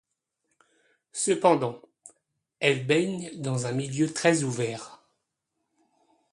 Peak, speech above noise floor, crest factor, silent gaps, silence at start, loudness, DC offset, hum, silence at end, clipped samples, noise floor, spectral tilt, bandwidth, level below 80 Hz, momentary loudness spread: -6 dBFS; 55 dB; 24 dB; none; 1.15 s; -26 LUFS; under 0.1%; none; 1.4 s; under 0.1%; -81 dBFS; -4.5 dB/octave; 11.5 kHz; -70 dBFS; 13 LU